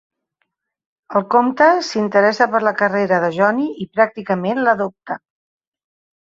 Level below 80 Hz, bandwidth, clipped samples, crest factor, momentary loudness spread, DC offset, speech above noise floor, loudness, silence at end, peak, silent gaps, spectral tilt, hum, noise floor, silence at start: -64 dBFS; 7.8 kHz; under 0.1%; 16 dB; 8 LU; under 0.1%; 56 dB; -17 LUFS; 1.1 s; -2 dBFS; none; -5.5 dB/octave; none; -72 dBFS; 1.1 s